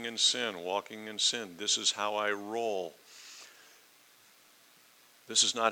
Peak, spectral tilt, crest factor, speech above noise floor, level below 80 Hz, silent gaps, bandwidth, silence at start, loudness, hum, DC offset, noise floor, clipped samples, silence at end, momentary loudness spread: -12 dBFS; 0 dB/octave; 22 dB; 29 dB; under -90 dBFS; none; 20 kHz; 0 s; -30 LUFS; none; under 0.1%; -61 dBFS; under 0.1%; 0 s; 22 LU